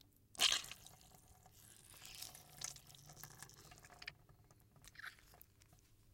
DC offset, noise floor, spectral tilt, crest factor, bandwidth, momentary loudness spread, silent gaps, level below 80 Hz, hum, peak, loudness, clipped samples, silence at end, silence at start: under 0.1%; -69 dBFS; 0.5 dB/octave; 32 dB; 17 kHz; 29 LU; none; -72 dBFS; none; -18 dBFS; -43 LUFS; under 0.1%; 0.05 s; 0.35 s